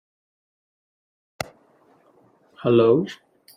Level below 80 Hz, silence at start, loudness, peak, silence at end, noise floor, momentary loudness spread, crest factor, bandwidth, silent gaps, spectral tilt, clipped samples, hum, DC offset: -66 dBFS; 2.6 s; -20 LUFS; -4 dBFS; 0.45 s; -58 dBFS; 18 LU; 20 dB; 15.5 kHz; none; -7 dB/octave; under 0.1%; none; under 0.1%